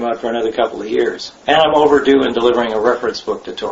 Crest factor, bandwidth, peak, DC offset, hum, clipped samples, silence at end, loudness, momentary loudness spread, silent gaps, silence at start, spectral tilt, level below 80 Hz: 16 dB; 8 kHz; 0 dBFS; under 0.1%; none; under 0.1%; 0 s; -15 LUFS; 11 LU; none; 0 s; -4.5 dB/octave; -48 dBFS